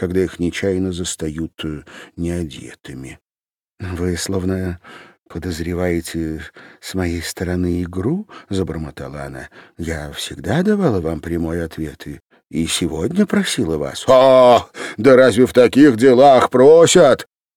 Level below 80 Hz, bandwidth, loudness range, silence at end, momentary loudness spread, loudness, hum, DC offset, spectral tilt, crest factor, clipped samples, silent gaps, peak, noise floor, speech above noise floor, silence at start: -44 dBFS; 17 kHz; 14 LU; 0.35 s; 20 LU; -16 LUFS; none; under 0.1%; -5.5 dB/octave; 16 dB; under 0.1%; 12.23-12.27 s; -2 dBFS; under -90 dBFS; over 74 dB; 0 s